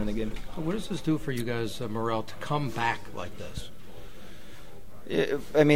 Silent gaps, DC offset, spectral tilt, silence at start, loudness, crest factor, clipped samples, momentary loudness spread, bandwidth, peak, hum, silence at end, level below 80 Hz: none; 2%; -6 dB/octave; 0 s; -31 LUFS; 22 dB; under 0.1%; 20 LU; 16 kHz; -8 dBFS; none; 0 s; -44 dBFS